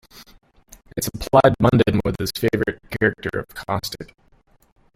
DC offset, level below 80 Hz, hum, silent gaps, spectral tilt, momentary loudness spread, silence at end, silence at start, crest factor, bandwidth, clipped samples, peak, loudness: under 0.1%; -42 dBFS; none; none; -6 dB/octave; 15 LU; 0.9 s; 0.15 s; 22 dB; 16.5 kHz; under 0.1%; 0 dBFS; -20 LUFS